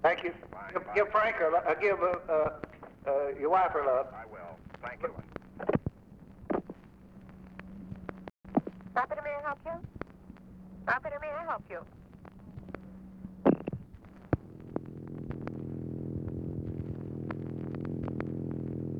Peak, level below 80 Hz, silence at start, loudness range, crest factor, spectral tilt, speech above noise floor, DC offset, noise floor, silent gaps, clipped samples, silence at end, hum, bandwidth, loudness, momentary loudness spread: -12 dBFS; -56 dBFS; 0 s; 9 LU; 22 dB; -8.5 dB/octave; 22 dB; under 0.1%; -53 dBFS; none; under 0.1%; 0 s; none; 7.2 kHz; -33 LUFS; 22 LU